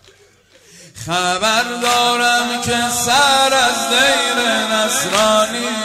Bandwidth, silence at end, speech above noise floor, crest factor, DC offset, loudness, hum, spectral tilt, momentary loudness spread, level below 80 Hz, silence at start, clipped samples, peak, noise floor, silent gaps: 16 kHz; 0 s; 35 dB; 16 dB; under 0.1%; -14 LUFS; none; -1.5 dB/octave; 6 LU; -50 dBFS; 0.8 s; under 0.1%; 0 dBFS; -50 dBFS; none